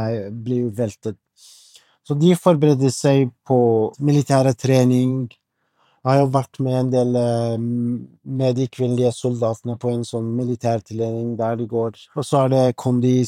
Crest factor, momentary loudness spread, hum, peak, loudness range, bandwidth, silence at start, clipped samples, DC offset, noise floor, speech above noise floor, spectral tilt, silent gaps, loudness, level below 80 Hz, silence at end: 18 dB; 10 LU; none; -2 dBFS; 5 LU; 13.5 kHz; 0 s; under 0.1%; under 0.1%; -64 dBFS; 45 dB; -7.5 dB/octave; none; -20 LUFS; -68 dBFS; 0 s